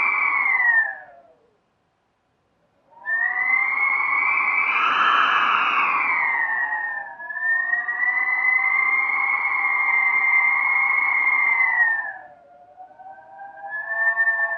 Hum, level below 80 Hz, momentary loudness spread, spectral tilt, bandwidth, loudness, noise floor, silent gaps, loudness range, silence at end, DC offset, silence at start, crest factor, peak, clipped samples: none; -76 dBFS; 10 LU; -1.5 dB/octave; 6.4 kHz; -18 LUFS; -68 dBFS; none; 5 LU; 0 s; under 0.1%; 0 s; 16 dB; -4 dBFS; under 0.1%